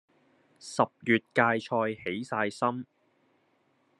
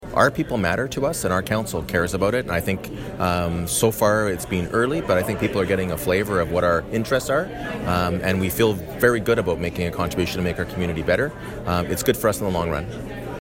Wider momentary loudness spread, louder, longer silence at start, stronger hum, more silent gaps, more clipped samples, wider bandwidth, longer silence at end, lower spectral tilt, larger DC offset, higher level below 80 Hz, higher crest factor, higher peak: first, 14 LU vs 6 LU; second, -29 LUFS vs -22 LUFS; first, 0.65 s vs 0 s; neither; neither; neither; second, 11.5 kHz vs 16.5 kHz; first, 1.15 s vs 0 s; about the same, -5.5 dB/octave vs -5 dB/octave; neither; second, -76 dBFS vs -40 dBFS; first, 24 dB vs 18 dB; about the same, -6 dBFS vs -4 dBFS